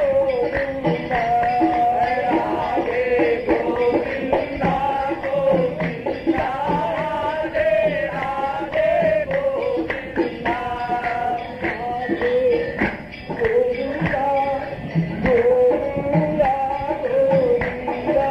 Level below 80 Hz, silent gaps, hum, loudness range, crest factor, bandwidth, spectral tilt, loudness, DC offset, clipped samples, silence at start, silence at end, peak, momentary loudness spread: -44 dBFS; none; none; 3 LU; 14 dB; 8.2 kHz; -8 dB/octave; -21 LUFS; under 0.1%; under 0.1%; 0 s; 0 s; -6 dBFS; 6 LU